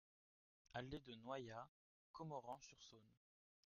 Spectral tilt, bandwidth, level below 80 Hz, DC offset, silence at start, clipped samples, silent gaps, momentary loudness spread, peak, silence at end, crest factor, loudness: -4.5 dB/octave; 7 kHz; -78 dBFS; under 0.1%; 0.7 s; under 0.1%; 1.68-2.14 s; 12 LU; -34 dBFS; 0.6 s; 22 dB; -55 LUFS